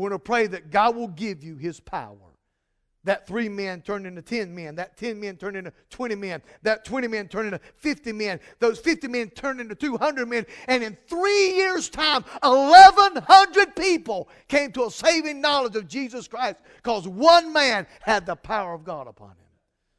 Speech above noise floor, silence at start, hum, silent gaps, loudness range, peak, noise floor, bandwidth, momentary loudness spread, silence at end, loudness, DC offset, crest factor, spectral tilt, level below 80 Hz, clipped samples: 53 dB; 0 s; none; none; 16 LU; 0 dBFS; -75 dBFS; 11 kHz; 18 LU; 0.9 s; -20 LUFS; under 0.1%; 22 dB; -3 dB/octave; -56 dBFS; under 0.1%